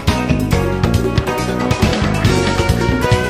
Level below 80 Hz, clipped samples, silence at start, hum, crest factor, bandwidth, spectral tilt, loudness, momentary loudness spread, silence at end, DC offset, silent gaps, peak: -24 dBFS; under 0.1%; 0 s; none; 14 dB; 16 kHz; -6 dB/octave; -16 LUFS; 3 LU; 0 s; under 0.1%; none; 0 dBFS